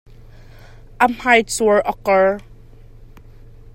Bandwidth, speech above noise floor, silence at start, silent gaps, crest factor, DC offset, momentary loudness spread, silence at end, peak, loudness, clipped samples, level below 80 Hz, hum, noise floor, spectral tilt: 16.5 kHz; 25 dB; 1 s; none; 20 dB; under 0.1%; 5 LU; 1.2 s; 0 dBFS; -16 LUFS; under 0.1%; -42 dBFS; none; -41 dBFS; -3.5 dB/octave